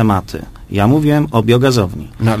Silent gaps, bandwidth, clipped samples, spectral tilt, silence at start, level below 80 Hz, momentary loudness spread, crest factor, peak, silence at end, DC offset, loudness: none; 15.5 kHz; under 0.1%; -7 dB/octave; 0 s; -34 dBFS; 11 LU; 14 dB; 0 dBFS; 0 s; under 0.1%; -14 LUFS